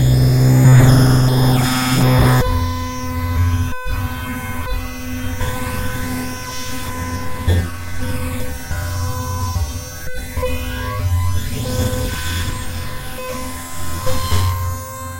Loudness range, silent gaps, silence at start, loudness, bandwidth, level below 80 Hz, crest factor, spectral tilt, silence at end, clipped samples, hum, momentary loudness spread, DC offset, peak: 10 LU; none; 0 s; -18 LUFS; 16 kHz; -26 dBFS; 16 dB; -5.5 dB/octave; 0 s; under 0.1%; none; 14 LU; under 0.1%; 0 dBFS